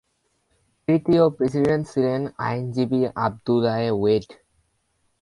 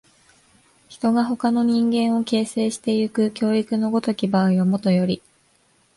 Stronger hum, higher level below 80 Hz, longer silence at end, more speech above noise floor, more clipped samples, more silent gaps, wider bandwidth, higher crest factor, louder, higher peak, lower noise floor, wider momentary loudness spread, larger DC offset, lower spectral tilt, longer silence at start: neither; first, -56 dBFS vs -62 dBFS; about the same, 0.9 s vs 0.8 s; first, 48 dB vs 41 dB; neither; neither; about the same, 11.5 kHz vs 11.5 kHz; about the same, 16 dB vs 14 dB; about the same, -22 LUFS vs -21 LUFS; about the same, -6 dBFS vs -8 dBFS; first, -69 dBFS vs -61 dBFS; first, 7 LU vs 4 LU; neither; first, -8 dB/octave vs -6.5 dB/octave; about the same, 0.9 s vs 0.9 s